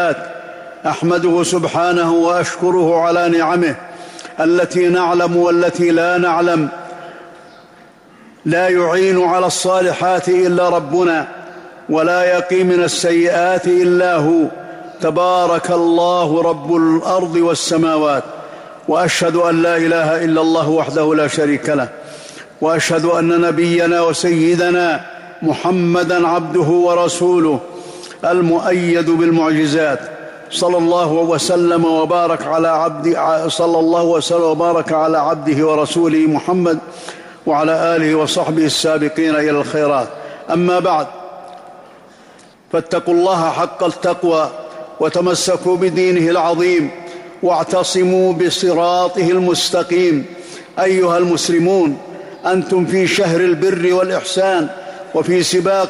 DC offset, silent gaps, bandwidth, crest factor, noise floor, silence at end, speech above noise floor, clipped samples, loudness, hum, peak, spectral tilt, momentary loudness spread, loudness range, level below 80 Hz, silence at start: under 0.1%; none; 14.5 kHz; 8 dB; -44 dBFS; 0 s; 30 dB; under 0.1%; -14 LUFS; none; -6 dBFS; -5 dB/octave; 11 LU; 2 LU; -58 dBFS; 0 s